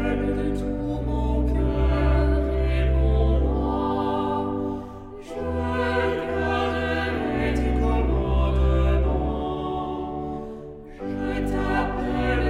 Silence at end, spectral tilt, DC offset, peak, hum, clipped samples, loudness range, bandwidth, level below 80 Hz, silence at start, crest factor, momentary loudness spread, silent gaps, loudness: 0 s; -8 dB/octave; under 0.1%; -10 dBFS; none; under 0.1%; 3 LU; 6 kHz; -26 dBFS; 0 s; 12 dB; 10 LU; none; -25 LUFS